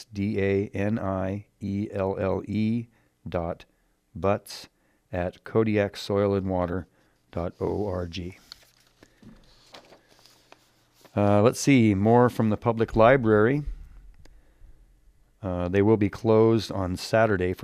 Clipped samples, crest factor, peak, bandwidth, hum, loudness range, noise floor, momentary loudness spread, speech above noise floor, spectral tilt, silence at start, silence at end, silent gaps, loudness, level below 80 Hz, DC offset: under 0.1%; 22 dB; -4 dBFS; 14.5 kHz; none; 13 LU; -62 dBFS; 15 LU; 38 dB; -7 dB/octave; 0 s; 0 s; none; -25 LUFS; -50 dBFS; under 0.1%